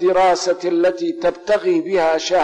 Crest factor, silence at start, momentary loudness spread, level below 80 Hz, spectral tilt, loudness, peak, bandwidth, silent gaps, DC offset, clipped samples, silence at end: 8 dB; 0 s; 5 LU; -54 dBFS; -4 dB/octave; -18 LUFS; -10 dBFS; 9.8 kHz; none; under 0.1%; under 0.1%; 0 s